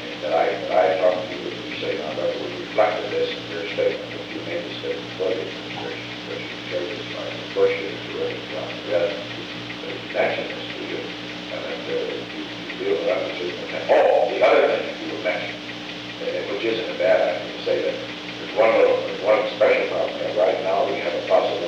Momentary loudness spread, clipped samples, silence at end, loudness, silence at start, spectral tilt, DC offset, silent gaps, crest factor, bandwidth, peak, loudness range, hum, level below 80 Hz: 12 LU; under 0.1%; 0 s; -23 LUFS; 0 s; -4.5 dB/octave; under 0.1%; none; 18 dB; 8.8 kHz; -4 dBFS; 7 LU; 60 Hz at -50 dBFS; -60 dBFS